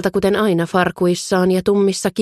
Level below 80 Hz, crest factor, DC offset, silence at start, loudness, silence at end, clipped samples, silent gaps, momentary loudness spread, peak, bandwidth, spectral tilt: -48 dBFS; 12 dB; under 0.1%; 0 s; -17 LUFS; 0 s; under 0.1%; none; 2 LU; -4 dBFS; 13.5 kHz; -5.5 dB/octave